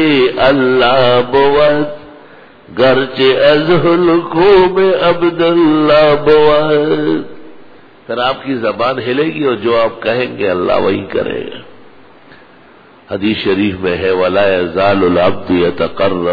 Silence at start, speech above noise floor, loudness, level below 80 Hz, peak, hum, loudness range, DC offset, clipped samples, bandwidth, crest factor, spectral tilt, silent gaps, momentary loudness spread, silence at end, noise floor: 0 s; 30 dB; -11 LUFS; -40 dBFS; 0 dBFS; none; 8 LU; under 0.1%; under 0.1%; 5.4 kHz; 12 dB; -8 dB/octave; none; 9 LU; 0 s; -41 dBFS